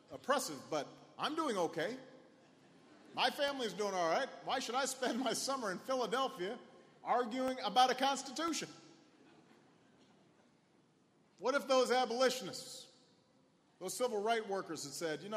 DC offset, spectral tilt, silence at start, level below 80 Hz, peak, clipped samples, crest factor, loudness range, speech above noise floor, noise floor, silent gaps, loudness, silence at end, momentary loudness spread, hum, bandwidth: under 0.1%; -2.5 dB/octave; 0.1 s; -86 dBFS; -16 dBFS; under 0.1%; 22 dB; 4 LU; 34 dB; -71 dBFS; none; -37 LUFS; 0 s; 12 LU; none; 15 kHz